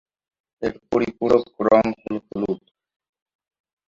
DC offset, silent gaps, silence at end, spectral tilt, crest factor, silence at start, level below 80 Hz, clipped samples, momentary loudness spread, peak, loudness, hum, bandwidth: under 0.1%; none; 1.3 s; -7.5 dB/octave; 22 dB; 0.6 s; -56 dBFS; under 0.1%; 12 LU; -2 dBFS; -22 LUFS; none; 7.4 kHz